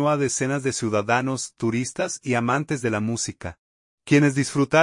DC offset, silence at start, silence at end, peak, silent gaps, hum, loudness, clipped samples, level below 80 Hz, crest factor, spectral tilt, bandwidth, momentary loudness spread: under 0.1%; 0 s; 0 s; -4 dBFS; 3.58-3.98 s; none; -23 LUFS; under 0.1%; -60 dBFS; 20 dB; -5 dB/octave; 11 kHz; 9 LU